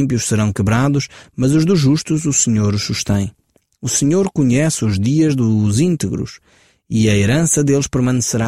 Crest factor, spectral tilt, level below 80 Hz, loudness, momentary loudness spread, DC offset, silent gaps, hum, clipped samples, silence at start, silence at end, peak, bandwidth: 12 dB; -5 dB/octave; -42 dBFS; -16 LUFS; 7 LU; under 0.1%; none; none; under 0.1%; 0 s; 0 s; -2 dBFS; 15.5 kHz